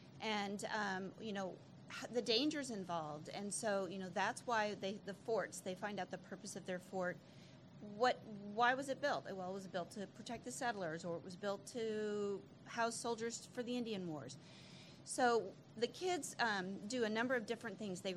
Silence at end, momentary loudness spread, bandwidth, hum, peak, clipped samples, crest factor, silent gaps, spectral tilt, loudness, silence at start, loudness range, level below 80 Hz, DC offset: 0 s; 13 LU; 14 kHz; none; -22 dBFS; under 0.1%; 22 dB; none; -3.5 dB/octave; -42 LUFS; 0 s; 4 LU; -82 dBFS; under 0.1%